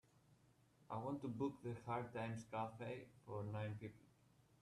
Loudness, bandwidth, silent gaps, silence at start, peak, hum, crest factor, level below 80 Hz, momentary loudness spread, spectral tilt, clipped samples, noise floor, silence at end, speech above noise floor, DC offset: -49 LUFS; 12.5 kHz; none; 0.3 s; -32 dBFS; none; 16 dB; -78 dBFS; 7 LU; -7.5 dB/octave; under 0.1%; -74 dBFS; 0.5 s; 26 dB; under 0.1%